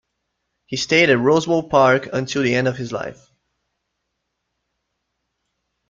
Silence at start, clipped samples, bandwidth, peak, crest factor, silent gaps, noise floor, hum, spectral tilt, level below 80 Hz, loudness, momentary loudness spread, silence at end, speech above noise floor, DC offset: 0.7 s; under 0.1%; 7.6 kHz; -2 dBFS; 20 dB; none; -76 dBFS; none; -5 dB/octave; -58 dBFS; -17 LUFS; 14 LU; 2.75 s; 58 dB; under 0.1%